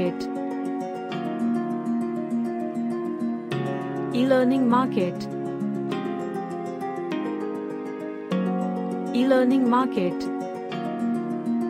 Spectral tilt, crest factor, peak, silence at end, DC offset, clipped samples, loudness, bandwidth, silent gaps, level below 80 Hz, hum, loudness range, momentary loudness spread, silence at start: -7.5 dB/octave; 18 dB; -8 dBFS; 0 s; under 0.1%; under 0.1%; -26 LUFS; 10.5 kHz; none; -70 dBFS; none; 5 LU; 11 LU; 0 s